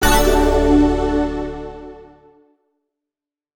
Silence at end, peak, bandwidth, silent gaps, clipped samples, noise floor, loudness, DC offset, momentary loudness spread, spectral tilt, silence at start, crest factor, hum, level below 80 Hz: 1.5 s; -2 dBFS; over 20 kHz; none; under 0.1%; -88 dBFS; -16 LUFS; under 0.1%; 20 LU; -5 dB/octave; 0 s; 16 dB; none; -24 dBFS